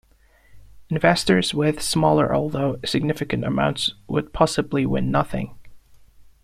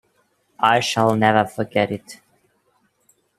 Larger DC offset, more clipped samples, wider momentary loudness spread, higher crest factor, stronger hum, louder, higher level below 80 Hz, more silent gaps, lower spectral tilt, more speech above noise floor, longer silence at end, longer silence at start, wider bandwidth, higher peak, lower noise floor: neither; neither; about the same, 8 LU vs 7 LU; about the same, 20 dB vs 22 dB; neither; about the same, -21 LUFS vs -19 LUFS; first, -44 dBFS vs -62 dBFS; neither; about the same, -5 dB/octave vs -5 dB/octave; second, 34 dB vs 46 dB; second, 0.2 s vs 1.25 s; about the same, 0.55 s vs 0.6 s; about the same, 15 kHz vs 15 kHz; about the same, -2 dBFS vs 0 dBFS; second, -55 dBFS vs -65 dBFS